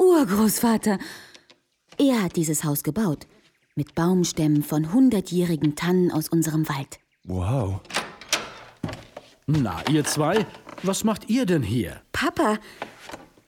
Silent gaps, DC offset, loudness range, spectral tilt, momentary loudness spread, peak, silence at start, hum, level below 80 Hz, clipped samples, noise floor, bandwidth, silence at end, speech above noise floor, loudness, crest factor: none; under 0.1%; 4 LU; -5.5 dB/octave; 16 LU; -8 dBFS; 0 s; none; -52 dBFS; under 0.1%; -59 dBFS; 19.5 kHz; 0.25 s; 37 dB; -23 LUFS; 16 dB